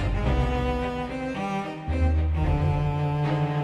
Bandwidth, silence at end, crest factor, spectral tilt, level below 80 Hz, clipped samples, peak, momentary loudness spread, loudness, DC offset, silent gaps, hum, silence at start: 8.6 kHz; 0 s; 12 dB; -8 dB/octave; -30 dBFS; under 0.1%; -12 dBFS; 6 LU; -26 LUFS; under 0.1%; none; none; 0 s